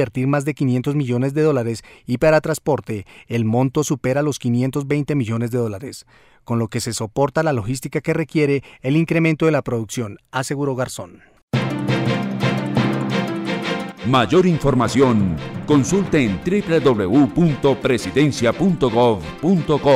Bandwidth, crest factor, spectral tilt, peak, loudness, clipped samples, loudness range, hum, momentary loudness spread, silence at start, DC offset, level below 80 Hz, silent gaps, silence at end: 15.5 kHz; 16 dB; -6.5 dB/octave; -4 dBFS; -19 LUFS; under 0.1%; 5 LU; none; 9 LU; 0 s; under 0.1%; -44 dBFS; 11.43-11.48 s; 0 s